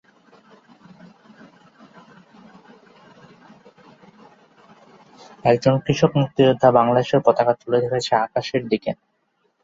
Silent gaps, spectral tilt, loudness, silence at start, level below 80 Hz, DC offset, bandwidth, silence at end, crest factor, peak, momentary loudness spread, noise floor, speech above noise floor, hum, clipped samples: none; -6.5 dB/octave; -19 LUFS; 5.45 s; -58 dBFS; under 0.1%; 7.8 kHz; 0.7 s; 20 dB; -2 dBFS; 9 LU; -68 dBFS; 50 dB; none; under 0.1%